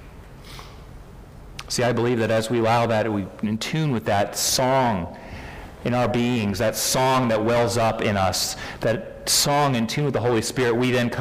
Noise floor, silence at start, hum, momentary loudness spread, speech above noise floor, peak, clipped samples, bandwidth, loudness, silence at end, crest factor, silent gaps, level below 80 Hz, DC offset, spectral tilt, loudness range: -42 dBFS; 0 s; none; 18 LU; 20 dB; -8 dBFS; under 0.1%; 16 kHz; -22 LUFS; 0 s; 14 dB; none; -46 dBFS; under 0.1%; -4 dB/octave; 3 LU